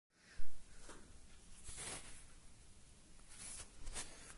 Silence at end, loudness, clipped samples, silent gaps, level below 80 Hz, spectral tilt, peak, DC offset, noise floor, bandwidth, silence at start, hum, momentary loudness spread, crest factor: 0 s; -53 LUFS; under 0.1%; none; -60 dBFS; -2 dB/octave; -24 dBFS; under 0.1%; -60 dBFS; 11.5 kHz; 0.1 s; none; 16 LU; 18 dB